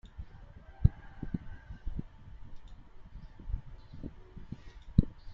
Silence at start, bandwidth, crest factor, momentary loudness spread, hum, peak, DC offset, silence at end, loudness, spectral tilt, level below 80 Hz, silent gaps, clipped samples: 0.05 s; 5.6 kHz; 30 dB; 24 LU; none; -6 dBFS; under 0.1%; 0 s; -36 LUFS; -10 dB/octave; -40 dBFS; none; under 0.1%